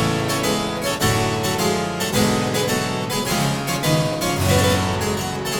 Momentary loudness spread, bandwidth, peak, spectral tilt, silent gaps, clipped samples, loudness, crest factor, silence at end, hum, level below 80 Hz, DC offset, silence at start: 4 LU; 19 kHz; -4 dBFS; -4 dB/octave; none; under 0.1%; -20 LUFS; 16 dB; 0 s; none; -40 dBFS; under 0.1%; 0 s